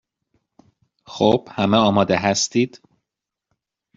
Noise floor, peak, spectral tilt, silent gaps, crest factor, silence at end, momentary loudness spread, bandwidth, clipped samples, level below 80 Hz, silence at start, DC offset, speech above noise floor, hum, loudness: -85 dBFS; -2 dBFS; -4.5 dB/octave; none; 20 dB; 1.2 s; 7 LU; 7.8 kHz; under 0.1%; -58 dBFS; 1.1 s; under 0.1%; 67 dB; none; -19 LUFS